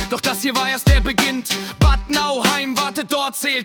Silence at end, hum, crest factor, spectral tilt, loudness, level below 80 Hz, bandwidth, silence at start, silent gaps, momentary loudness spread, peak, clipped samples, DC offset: 0 s; none; 16 dB; -4 dB/octave; -18 LUFS; -24 dBFS; 19 kHz; 0 s; none; 5 LU; -2 dBFS; under 0.1%; under 0.1%